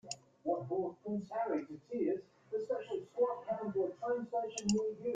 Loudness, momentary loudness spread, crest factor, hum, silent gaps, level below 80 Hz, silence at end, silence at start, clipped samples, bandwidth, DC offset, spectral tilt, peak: -38 LUFS; 7 LU; 22 dB; none; none; -74 dBFS; 0 s; 0.05 s; under 0.1%; 9.6 kHz; under 0.1%; -5 dB/octave; -16 dBFS